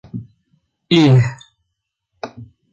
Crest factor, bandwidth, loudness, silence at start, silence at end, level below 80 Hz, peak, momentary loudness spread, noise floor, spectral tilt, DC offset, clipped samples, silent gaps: 16 dB; 7.6 kHz; -14 LUFS; 0.15 s; 0.3 s; -54 dBFS; -2 dBFS; 22 LU; -76 dBFS; -7 dB/octave; under 0.1%; under 0.1%; none